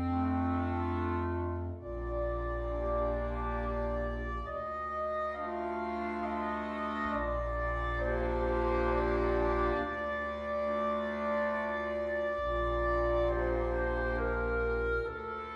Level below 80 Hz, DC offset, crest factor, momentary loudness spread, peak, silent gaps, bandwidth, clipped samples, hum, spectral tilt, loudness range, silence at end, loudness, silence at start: -40 dBFS; under 0.1%; 14 dB; 6 LU; -18 dBFS; none; 6.8 kHz; under 0.1%; none; -8.5 dB/octave; 4 LU; 0 s; -33 LUFS; 0 s